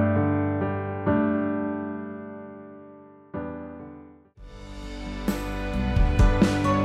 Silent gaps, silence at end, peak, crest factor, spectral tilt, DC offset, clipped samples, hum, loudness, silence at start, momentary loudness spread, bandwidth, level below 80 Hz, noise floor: none; 0 s; -8 dBFS; 18 dB; -7.5 dB/octave; under 0.1%; under 0.1%; none; -26 LUFS; 0 s; 22 LU; 14 kHz; -32 dBFS; -48 dBFS